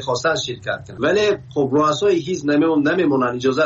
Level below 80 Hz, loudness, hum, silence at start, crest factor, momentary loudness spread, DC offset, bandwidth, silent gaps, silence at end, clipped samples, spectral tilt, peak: -54 dBFS; -19 LUFS; none; 0 s; 12 dB; 6 LU; under 0.1%; 7.8 kHz; none; 0 s; under 0.1%; -5 dB/octave; -6 dBFS